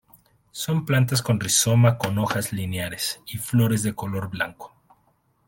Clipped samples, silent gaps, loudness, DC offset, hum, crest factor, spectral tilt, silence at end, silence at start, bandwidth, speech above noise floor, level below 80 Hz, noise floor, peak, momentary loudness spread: under 0.1%; none; -23 LUFS; under 0.1%; none; 20 dB; -4.5 dB/octave; 0.8 s; 0.55 s; 17 kHz; 42 dB; -56 dBFS; -65 dBFS; -4 dBFS; 11 LU